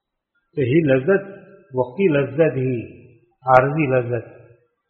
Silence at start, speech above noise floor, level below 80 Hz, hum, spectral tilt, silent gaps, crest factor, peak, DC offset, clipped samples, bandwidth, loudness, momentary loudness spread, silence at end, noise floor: 0.55 s; 54 dB; -56 dBFS; none; -7 dB/octave; none; 20 dB; 0 dBFS; under 0.1%; under 0.1%; 4.3 kHz; -19 LUFS; 14 LU; 0.6 s; -72 dBFS